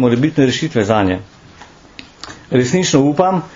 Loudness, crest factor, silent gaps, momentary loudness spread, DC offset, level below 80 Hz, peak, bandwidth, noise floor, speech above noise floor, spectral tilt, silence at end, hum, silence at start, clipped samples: -15 LUFS; 16 dB; none; 17 LU; under 0.1%; -48 dBFS; 0 dBFS; 7.6 kHz; -41 dBFS; 27 dB; -5.5 dB/octave; 0 s; none; 0 s; under 0.1%